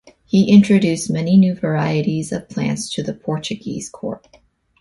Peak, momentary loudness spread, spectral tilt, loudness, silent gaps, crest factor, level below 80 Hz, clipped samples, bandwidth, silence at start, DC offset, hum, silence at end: 0 dBFS; 16 LU; -6.5 dB/octave; -18 LUFS; none; 16 dB; -54 dBFS; under 0.1%; 11.5 kHz; 0.35 s; under 0.1%; none; 0.65 s